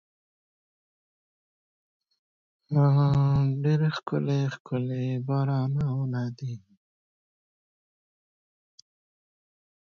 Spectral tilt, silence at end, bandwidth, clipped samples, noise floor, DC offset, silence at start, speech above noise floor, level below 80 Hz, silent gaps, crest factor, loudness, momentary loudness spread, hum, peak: -9 dB/octave; 3.25 s; 6.6 kHz; under 0.1%; under -90 dBFS; under 0.1%; 2.7 s; over 65 dB; -56 dBFS; 4.60-4.65 s; 14 dB; -26 LUFS; 10 LU; none; -14 dBFS